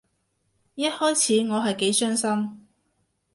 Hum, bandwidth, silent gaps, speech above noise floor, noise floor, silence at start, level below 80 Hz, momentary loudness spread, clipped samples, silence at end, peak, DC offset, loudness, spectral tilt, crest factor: none; 11.5 kHz; none; 49 dB; -72 dBFS; 0.75 s; -72 dBFS; 8 LU; under 0.1%; 0.75 s; -10 dBFS; under 0.1%; -23 LUFS; -3 dB/octave; 16 dB